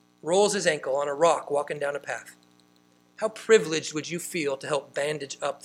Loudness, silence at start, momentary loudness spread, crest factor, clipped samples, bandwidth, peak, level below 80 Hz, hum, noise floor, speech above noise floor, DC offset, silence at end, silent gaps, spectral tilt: -26 LUFS; 0.25 s; 11 LU; 22 dB; under 0.1%; 15.5 kHz; -6 dBFS; -78 dBFS; 60 Hz at -60 dBFS; -61 dBFS; 35 dB; under 0.1%; 0.05 s; none; -3 dB/octave